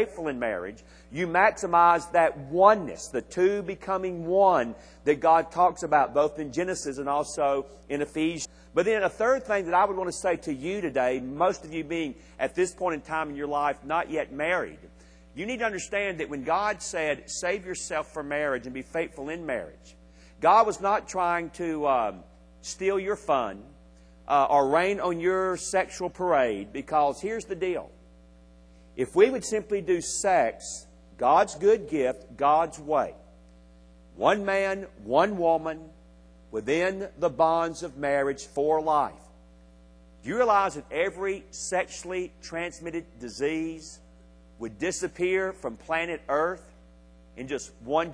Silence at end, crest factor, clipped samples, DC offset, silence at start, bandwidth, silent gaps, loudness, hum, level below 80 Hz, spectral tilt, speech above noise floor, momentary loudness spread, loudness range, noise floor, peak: 0 s; 22 dB; under 0.1%; under 0.1%; 0 s; 10.5 kHz; none; -27 LUFS; none; -54 dBFS; -4 dB/octave; 27 dB; 13 LU; 6 LU; -53 dBFS; -4 dBFS